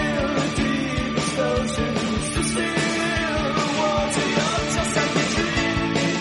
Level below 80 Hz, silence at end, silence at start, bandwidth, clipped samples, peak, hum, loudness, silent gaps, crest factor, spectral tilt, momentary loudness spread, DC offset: -36 dBFS; 0 s; 0 s; 11.5 kHz; under 0.1%; -8 dBFS; none; -22 LUFS; none; 14 dB; -4 dB/octave; 3 LU; under 0.1%